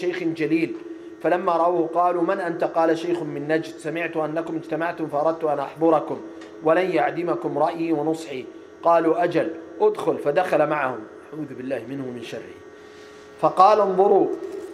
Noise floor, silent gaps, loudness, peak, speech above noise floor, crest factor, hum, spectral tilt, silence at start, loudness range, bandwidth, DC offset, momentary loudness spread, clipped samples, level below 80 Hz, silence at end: -43 dBFS; none; -22 LUFS; -2 dBFS; 22 dB; 20 dB; none; -6.5 dB/octave; 0 s; 3 LU; 12.5 kHz; under 0.1%; 15 LU; under 0.1%; -72 dBFS; 0 s